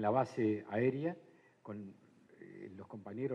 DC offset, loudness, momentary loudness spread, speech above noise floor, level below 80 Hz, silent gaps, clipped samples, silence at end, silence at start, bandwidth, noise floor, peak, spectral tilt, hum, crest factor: under 0.1%; -37 LUFS; 21 LU; 22 dB; -82 dBFS; none; under 0.1%; 0 s; 0 s; 9.6 kHz; -58 dBFS; -18 dBFS; -8.5 dB/octave; none; 20 dB